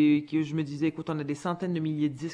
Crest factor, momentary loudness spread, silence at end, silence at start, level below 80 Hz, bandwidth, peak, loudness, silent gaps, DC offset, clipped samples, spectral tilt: 14 dB; 6 LU; 0 s; 0 s; -68 dBFS; 10 kHz; -14 dBFS; -30 LUFS; none; under 0.1%; under 0.1%; -7.5 dB/octave